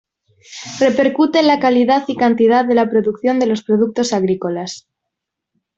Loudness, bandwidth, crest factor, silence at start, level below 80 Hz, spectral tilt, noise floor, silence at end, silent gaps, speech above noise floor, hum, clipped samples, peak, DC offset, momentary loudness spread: -15 LUFS; 8 kHz; 14 dB; 0.5 s; -60 dBFS; -5 dB/octave; -79 dBFS; 1 s; none; 65 dB; none; under 0.1%; -2 dBFS; under 0.1%; 14 LU